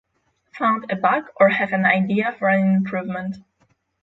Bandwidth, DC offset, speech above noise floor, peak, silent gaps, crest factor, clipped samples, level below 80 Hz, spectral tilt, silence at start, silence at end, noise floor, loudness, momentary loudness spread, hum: 5.8 kHz; under 0.1%; 46 dB; -2 dBFS; none; 18 dB; under 0.1%; -64 dBFS; -8.5 dB/octave; 0.55 s; 0.65 s; -66 dBFS; -20 LUFS; 11 LU; none